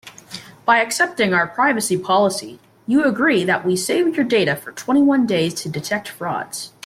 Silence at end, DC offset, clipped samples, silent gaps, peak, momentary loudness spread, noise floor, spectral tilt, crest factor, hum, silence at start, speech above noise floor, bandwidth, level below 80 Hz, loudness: 0.15 s; under 0.1%; under 0.1%; none; -4 dBFS; 12 LU; -38 dBFS; -4 dB/octave; 14 dB; none; 0.05 s; 20 dB; 16 kHz; -62 dBFS; -18 LUFS